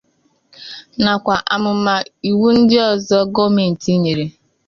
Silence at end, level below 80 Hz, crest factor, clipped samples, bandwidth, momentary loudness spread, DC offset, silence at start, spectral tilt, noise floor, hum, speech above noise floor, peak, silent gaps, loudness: 0.35 s; -52 dBFS; 14 dB; under 0.1%; 7.4 kHz; 16 LU; under 0.1%; 0.6 s; -6 dB/octave; -61 dBFS; none; 46 dB; -2 dBFS; none; -15 LUFS